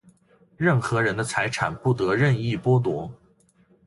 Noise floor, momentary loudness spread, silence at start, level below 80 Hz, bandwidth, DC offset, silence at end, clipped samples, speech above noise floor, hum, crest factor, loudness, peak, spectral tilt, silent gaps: -60 dBFS; 5 LU; 0.6 s; -54 dBFS; 11.5 kHz; under 0.1%; 0.7 s; under 0.1%; 38 dB; none; 18 dB; -23 LUFS; -6 dBFS; -6.5 dB/octave; none